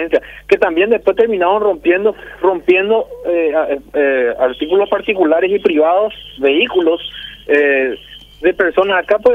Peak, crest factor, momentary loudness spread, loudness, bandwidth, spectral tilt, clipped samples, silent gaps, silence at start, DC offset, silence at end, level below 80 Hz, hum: 0 dBFS; 14 dB; 6 LU; -14 LUFS; 6 kHz; -6 dB/octave; under 0.1%; none; 0 s; under 0.1%; 0 s; -46 dBFS; 50 Hz at -50 dBFS